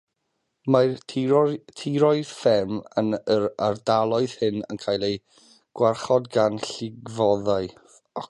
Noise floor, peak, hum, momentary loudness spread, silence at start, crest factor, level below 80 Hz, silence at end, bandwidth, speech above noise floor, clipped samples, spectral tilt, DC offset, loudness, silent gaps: -76 dBFS; -4 dBFS; none; 11 LU; 0.65 s; 20 dB; -60 dBFS; 0.05 s; 11.5 kHz; 53 dB; under 0.1%; -6 dB/octave; under 0.1%; -24 LUFS; none